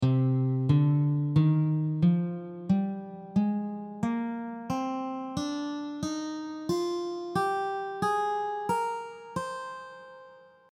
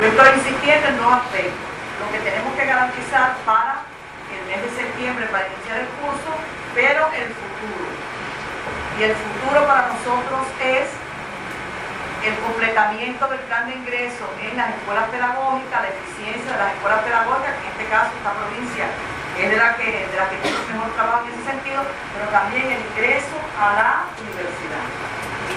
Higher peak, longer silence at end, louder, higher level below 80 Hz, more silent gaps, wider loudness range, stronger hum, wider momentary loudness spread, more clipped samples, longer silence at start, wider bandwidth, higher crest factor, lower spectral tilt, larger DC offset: second, -12 dBFS vs 0 dBFS; first, 0.3 s vs 0 s; second, -29 LUFS vs -20 LUFS; second, -64 dBFS vs -50 dBFS; neither; first, 6 LU vs 3 LU; neither; about the same, 12 LU vs 12 LU; neither; about the same, 0 s vs 0 s; second, 12 kHz vs 14.5 kHz; about the same, 16 dB vs 20 dB; first, -7.5 dB/octave vs -4 dB/octave; neither